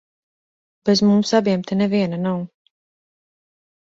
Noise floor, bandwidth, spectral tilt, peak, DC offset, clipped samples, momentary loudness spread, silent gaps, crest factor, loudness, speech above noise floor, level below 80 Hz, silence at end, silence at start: under -90 dBFS; 7.8 kHz; -6 dB/octave; -4 dBFS; under 0.1%; under 0.1%; 11 LU; none; 18 dB; -19 LUFS; over 72 dB; -60 dBFS; 1.5 s; 0.85 s